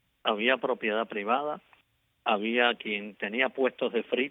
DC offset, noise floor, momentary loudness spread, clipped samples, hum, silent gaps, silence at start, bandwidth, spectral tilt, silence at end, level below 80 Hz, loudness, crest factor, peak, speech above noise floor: under 0.1%; -70 dBFS; 8 LU; under 0.1%; none; none; 0.25 s; 4 kHz; -6.5 dB/octave; 0 s; -82 dBFS; -28 LUFS; 20 dB; -10 dBFS; 41 dB